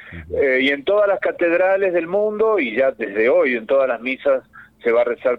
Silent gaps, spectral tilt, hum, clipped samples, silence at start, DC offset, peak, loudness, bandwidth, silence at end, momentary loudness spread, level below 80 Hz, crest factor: none; -6.5 dB/octave; none; under 0.1%; 0 s; under 0.1%; -6 dBFS; -18 LUFS; 5 kHz; 0 s; 5 LU; -54 dBFS; 12 dB